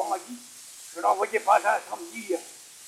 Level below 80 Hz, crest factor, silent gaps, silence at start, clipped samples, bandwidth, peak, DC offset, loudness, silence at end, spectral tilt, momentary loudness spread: -82 dBFS; 20 dB; none; 0 s; under 0.1%; 16 kHz; -8 dBFS; under 0.1%; -26 LUFS; 0 s; -1.5 dB/octave; 20 LU